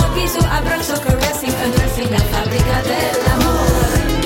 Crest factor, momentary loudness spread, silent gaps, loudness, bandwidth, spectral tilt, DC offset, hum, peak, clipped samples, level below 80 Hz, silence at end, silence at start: 12 dB; 3 LU; none; -16 LUFS; 17 kHz; -5 dB/octave; under 0.1%; none; -4 dBFS; under 0.1%; -22 dBFS; 0 s; 0 s